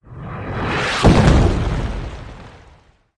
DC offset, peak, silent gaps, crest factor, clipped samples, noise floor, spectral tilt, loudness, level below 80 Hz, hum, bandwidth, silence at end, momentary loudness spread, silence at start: under 0.1%; -4 dBFS; none; 14 dB; under 0.1%; -50 dBFS; -6 dB/octave; -17 LUFS; -24 dBFS; none; 10.5 kHz; 0.7 s; 20 LU; 0.1 s